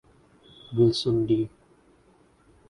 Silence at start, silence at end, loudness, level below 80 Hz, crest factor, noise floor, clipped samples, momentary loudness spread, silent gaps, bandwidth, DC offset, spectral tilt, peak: 0.7 s; 1.2 s; -25 LUFS; -58 dBFS; 18 dB; -60 dBFS; under 0.1%; 11 LU; none; 11 kHz; under 0.1%; -7.5 dB/octave; -10 dBFS